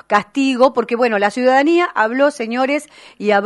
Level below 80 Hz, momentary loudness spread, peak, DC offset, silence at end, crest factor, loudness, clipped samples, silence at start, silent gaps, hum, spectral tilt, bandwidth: -64 dBFS; 6 LU; 0 dBFS; under 0.1%; 0 s; 16 dB; -16 LUFS; under 0.1%; 0.1 s; none; none; -4.5 dB/octave; 11.5 kHz